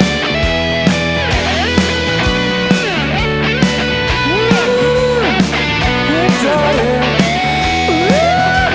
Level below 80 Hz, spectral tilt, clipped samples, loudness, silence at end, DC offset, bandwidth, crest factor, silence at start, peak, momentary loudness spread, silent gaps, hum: -26 dBFS; -5 dB/octave; under 0.1%; -13 LUFS; 0 s; 0.4%; 8 kHz; 12 dB; 0 s; 0 dBFS; 2 LU; none; none